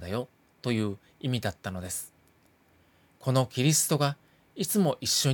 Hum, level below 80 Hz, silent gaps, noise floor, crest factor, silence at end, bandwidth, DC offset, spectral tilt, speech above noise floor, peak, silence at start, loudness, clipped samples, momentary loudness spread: none; -68 dBFS; none; -64 dBFS; 18 dB; 0 s; 19.5 kHz; under 0.1%; -4 dB/octave; 36 dB; -12 dBFS; 0 s; -29 LUFS; under 0.1%; 14 LU